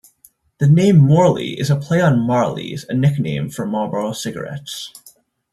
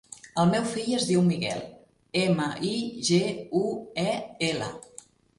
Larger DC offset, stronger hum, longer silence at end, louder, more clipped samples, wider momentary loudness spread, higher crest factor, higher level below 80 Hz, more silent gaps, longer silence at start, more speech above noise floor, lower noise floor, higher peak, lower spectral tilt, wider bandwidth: neither; neither; about the same, 0.45 s vs 0.55 s; first, -17 LUFS vs -27 LUFS; neither; first, 16 LU vs 11 LU; about the same, 14 dB vs 16 dB; first, -54 dBFS vs -62 dBFS; neither; first, 0.6 s vs 0.1 s; first, 37 dB vs 26 dB; about the same, -53 dBFS vs -52 dBFS; first, -2 dBFS vs -10 dBFS; first, -7 dB/octave vs -5 dB/octave; first, 13.5 kHz vs 11.5 kHz